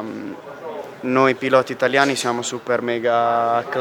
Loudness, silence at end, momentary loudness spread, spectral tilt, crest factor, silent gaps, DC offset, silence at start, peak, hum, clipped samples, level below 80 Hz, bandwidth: -19 LUFS; 0 s; 15 LU; -4 dB/octave; 20 dB; none; under 0.1%; 0 s; 0 dBFS; none; under 0.1%; -68 dBFS; 19.5 kHz